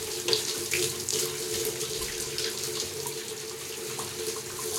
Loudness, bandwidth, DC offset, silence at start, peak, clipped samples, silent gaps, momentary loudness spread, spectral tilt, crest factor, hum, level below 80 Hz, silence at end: -30 LUFS; 17 kHz; under 0.1%; 0 s; -4 dBFS; under 0.1%; none; 8 LU; -1.5 dB/octave; 28 dB; none; -60 dBFS; 0 s